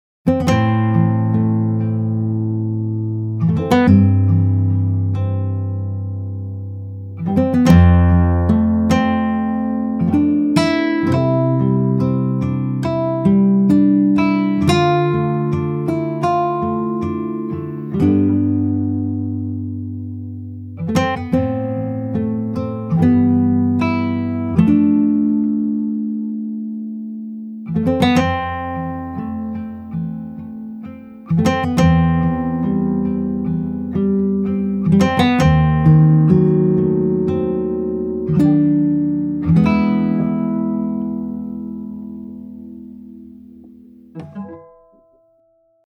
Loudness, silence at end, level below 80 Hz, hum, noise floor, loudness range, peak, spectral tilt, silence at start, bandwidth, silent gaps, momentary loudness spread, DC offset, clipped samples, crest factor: -17 LUFS; 1.25 s; -40 dBFS; none; -58 dBFS; 7 LU; 0 dBFS; -8.5 dB/octave; 0.25 s; 11.5 kHz; none; 15 LU; under 0.1%; under 0.1%; 16 dB